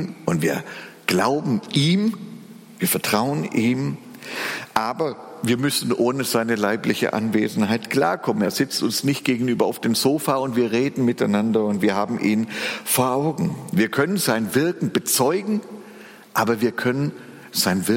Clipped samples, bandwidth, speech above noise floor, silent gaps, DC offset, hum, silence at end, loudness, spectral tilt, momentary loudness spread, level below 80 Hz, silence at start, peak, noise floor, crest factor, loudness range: under 0.1%; 17 kHz; 22 dB; none; under 0.1%; none; 0 s; -22 LUFS; -4.5 dB/octave; 8 LU; -64 dBFS; 0 s; -4 dBFS; -43 dBFS; 18 dB; 2 LU